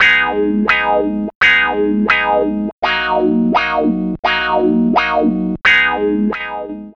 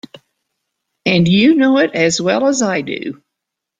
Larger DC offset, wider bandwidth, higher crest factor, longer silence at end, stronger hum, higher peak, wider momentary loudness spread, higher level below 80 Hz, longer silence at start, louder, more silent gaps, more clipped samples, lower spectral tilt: neither; second, 7.4 kHz vs 9.6 kHz; about the same, 12 dB vs 16 dB; second, 0.05 s vs 0.65 s; neither; about the same, -2 dBFS vs 0 dBFS; second, 8 LU vs 12 LU; first, -42 dBFS vs -52 dBFS; second, 0 s vs 1.05 s; about the same, -14 LUFS vs -14 LUFS; first, 1.35-1.41 s, 2.72-2.82 s, 4.19-4.23 s vs none; neither; about the same, -6 dB/octave vs -5 dB/octave